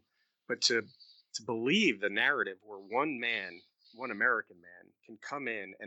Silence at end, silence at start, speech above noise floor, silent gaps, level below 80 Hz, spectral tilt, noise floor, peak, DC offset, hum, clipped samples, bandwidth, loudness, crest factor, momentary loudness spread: 0 s; 0.5 s; 27 dB; none; under -90 dBFS; -3 dB/octave; -61 dBFS; -14 dBFS; under 0.1%; none; under 0.1%; 8.6 kHz; -32 LUFS; 22 dB; 16 LU